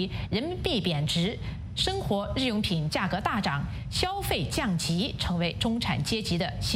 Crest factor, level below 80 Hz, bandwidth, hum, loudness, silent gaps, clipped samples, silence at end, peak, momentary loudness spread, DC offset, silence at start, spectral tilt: 18 dB; -42 dBFS; 16 kHz; none; -28 LUFS; none; under 0.1%; 0 s; -12 dBFS; 4 LU; under 0.1%; 0 s; -5 dB/octave